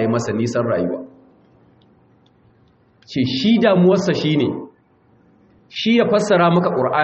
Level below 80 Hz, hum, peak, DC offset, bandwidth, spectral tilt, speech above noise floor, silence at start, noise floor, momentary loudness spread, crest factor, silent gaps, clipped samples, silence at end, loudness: -58 dBFS; none; -4 dBFS; under 0.1%; 8 kHz; -5 dB/octave; 39 dB; 0 s; -55 dBFS; 11 LU; 16 dB; none; under 0.1%; 0 s; -17 LUFS